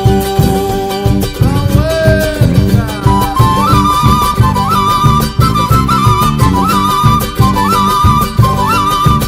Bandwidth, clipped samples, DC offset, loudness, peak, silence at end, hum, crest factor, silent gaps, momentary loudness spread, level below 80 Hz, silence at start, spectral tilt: 16.5 kHz; 1%; under 0.1%; -10 LUFS; 0 dBFS; 0 s; none; 10 dB; none; 3 LU; -20 dBFS; 0 s; -6 dB/octave